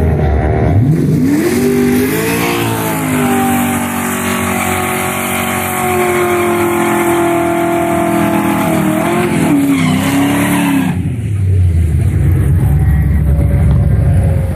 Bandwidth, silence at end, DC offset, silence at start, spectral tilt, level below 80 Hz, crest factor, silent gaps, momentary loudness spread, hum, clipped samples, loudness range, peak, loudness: 15 kHz; 0 s; under 0.1%; 0 s; -6 dB/octave; -22 dBFS; 10 dB; none; 3 LU; none; under 0.1%; 2 LU; -2 dBFS; -12 LUFS